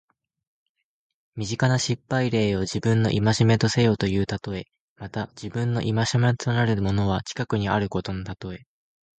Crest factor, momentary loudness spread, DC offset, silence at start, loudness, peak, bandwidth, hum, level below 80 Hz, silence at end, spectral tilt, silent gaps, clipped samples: 18 dB; 14 LU; under 0.1%; 1.35 s; -24 LUFS; -6 dBFS; 9.2 kHz; none; -46 dBFS; 0.65 s; -6 dB/octave; 4.80-4.96 s; under 0.1%